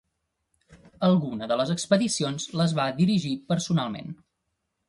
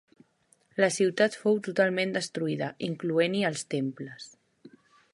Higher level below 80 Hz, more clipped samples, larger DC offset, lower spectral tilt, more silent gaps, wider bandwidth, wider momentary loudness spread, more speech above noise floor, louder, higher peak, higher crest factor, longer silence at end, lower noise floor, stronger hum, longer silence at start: first, -64 dBFS vs -74 dBFS; neither; neither; about the same, -5.5 dB/octave vs -4.5 dB/octave; neither; about the same, 11.5 kHz vs 11.5 kHz; second, 8 LU vs 14 LU; first, 54 dB vs 39 dB; first, -25 LUFS vs -28 LUFS; about the same, -6 dBFS vs -8 dBFS; about the same, 20 dB vs 20 dB; first, 0.75 s vs 0.45 s; first, -79 dBFS vs -67 dBFS; neither; about the same, 0.7 s vs 0.75 s